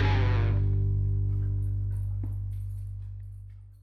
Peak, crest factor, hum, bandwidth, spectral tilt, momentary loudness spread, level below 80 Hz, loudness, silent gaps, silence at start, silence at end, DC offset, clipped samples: -14 dBFS; 14 dB; 50 Hz at -40 dBFS; 5.6 kHz; -8.5 dB/octave; 17 LU; -34 dBFS; -29 LUFS; none; 0 s; 0.05 s; under 0.1%; under 0.1%